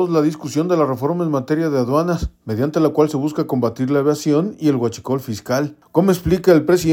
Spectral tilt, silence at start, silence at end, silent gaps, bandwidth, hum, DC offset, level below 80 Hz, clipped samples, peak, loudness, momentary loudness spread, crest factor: -7 dB/octave; 0 s; 0 s; none; 17 kHz; none; under 0.1%; -40 dBFS; under 0.1%; 0 dBFS; -18 LUFS; 7 LU; 16 dB